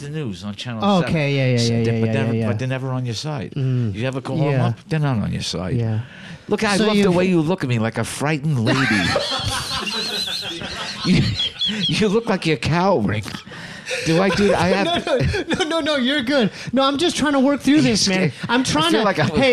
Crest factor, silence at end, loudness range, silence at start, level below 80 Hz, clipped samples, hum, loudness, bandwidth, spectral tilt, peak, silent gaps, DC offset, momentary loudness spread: 14 dB; 0 s; 4 LU; 0 s; -44 dBFS; under 0.1%; none; -19 LUFS; 14 kHz; -5 dB/octave; -6 dBFS; none; under 0.1%; 9 LU